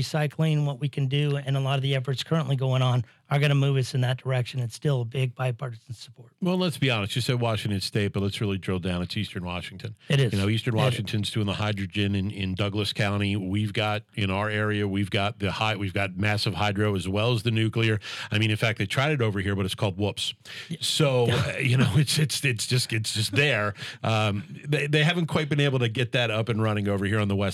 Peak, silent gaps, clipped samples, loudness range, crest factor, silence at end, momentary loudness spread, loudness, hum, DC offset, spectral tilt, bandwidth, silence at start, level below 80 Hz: -8 dBFS; none; under 0.1%; 3 LU; 16 dB; 0 s; 7 LU; -26 LUFS; none; under 0.1%; -5.5 dB/octave; 14.5 kHz; 0 s; -62 dBFS